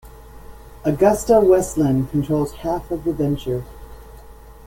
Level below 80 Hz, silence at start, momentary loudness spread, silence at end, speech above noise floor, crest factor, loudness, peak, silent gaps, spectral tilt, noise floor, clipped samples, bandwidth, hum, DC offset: -40 dBFS; 0.05 s; 12 LU; 0.1 s; 23 dB; 18 dB; -19 LUFS; -2 dBFS; none; -7 dB/octave; -41 dBFS; under 0.1%; 17 kHz; none; under 0.1%